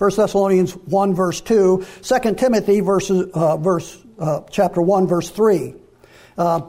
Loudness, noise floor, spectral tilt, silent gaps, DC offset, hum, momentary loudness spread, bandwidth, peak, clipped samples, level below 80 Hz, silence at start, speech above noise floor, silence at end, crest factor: -18 LUFS; -48 dBFS; -6.5 dB/octave; none; under 0.1%; none; 8 LU; 15.5 kHz; -6 dBFS; under 0.1%; -48 dBFS; 0 s; 31 dB; 0 s; 12 dB